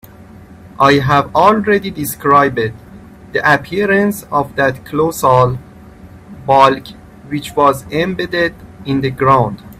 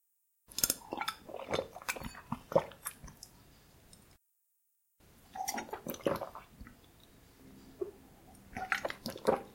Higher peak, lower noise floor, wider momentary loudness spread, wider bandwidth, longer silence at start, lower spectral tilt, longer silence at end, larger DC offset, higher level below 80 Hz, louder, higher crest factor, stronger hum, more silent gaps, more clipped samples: first, 0 dBFS vs -8 dBFS; second, -37 dBFS vs -78 dBFS; second, 11 LU vs 24 LU; about the same, 16 kHz vs 16.5 kHz; second, 0.2 s vs 0.5 s; first, -5.5 dB/octave vs -2.5 dB/octave; about the same, 0.05 s vs 0 s; neither; first, -42 dBFS vs -62 dBFS; first, -13 LUFS vs -38 LUFS; second, 14 dB vs 32 dB; neither; neither; neither